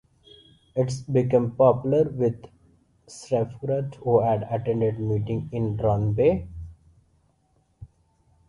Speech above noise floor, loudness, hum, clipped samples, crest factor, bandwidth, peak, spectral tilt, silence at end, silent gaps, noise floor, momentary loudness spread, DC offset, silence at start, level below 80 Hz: 43 dB; -24 LUFS; none; under 0.1%; 18 dB; 11 kHz; -6 dBFS; -8.5 dB/octave; 0.65 s; none; -66 dBFS; 14 LU; under 0.1%; 0.75 s; -48 dBFS